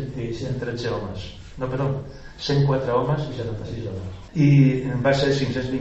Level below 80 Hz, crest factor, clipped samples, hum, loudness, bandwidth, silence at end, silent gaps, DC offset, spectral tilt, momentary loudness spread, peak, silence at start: -44 dBFS; 18 dB; under 0.1%; none; -23 LUFS; 8 kHz; 0 s; none; under 0.1%; -7.5 dB/octave; 15 LU; -4 dBFS; 0 s